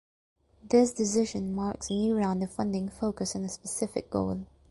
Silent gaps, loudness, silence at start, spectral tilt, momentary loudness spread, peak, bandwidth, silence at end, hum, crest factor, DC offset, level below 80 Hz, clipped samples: none; -30 LUFS; 0.65 s; -5.5 dB/octave; 9 LU; -12 dBFS; 11.5 kHz; 0.25 s; none; 18 dB; under 0.1%; -54 dBFS; under 0.1%